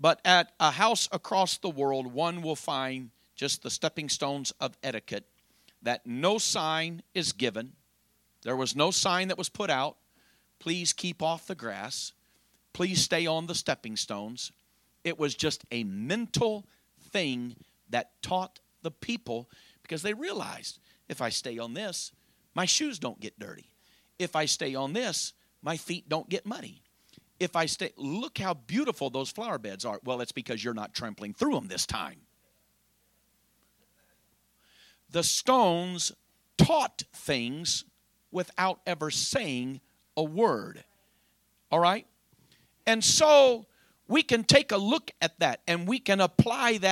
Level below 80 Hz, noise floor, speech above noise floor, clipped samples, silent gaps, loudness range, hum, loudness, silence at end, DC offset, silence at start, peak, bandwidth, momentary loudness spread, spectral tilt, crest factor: -62 dBFS; -70 dBFS; 41 dB; under 0.1%; none; 10 LU; none; -29 LUFS; 0 s; under 0.1%; 0 s; -4 dBFS; 16.5 kHz; 15 LU; -3 dB/octave; 26 dB